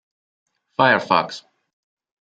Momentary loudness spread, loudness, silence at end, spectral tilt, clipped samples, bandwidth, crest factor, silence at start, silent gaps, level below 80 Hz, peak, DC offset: 16 LU; -18 LUFS; 0.9 s; -5 dB/octave; under 0.1%; 9 kHz; 22 dB; 0.8 s; none; -68 dBFS; -2 dBFS; under 0.1%